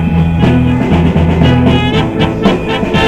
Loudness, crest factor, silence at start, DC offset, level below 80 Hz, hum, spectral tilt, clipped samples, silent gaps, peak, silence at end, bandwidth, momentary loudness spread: -10 LUFS; 10 dB; 0 s; under 0.1%; -24 dBFS; none; -7.5 dB/octave; 0.2%; none; 0 dBFS; 0 s; 9 kHz; 4 LU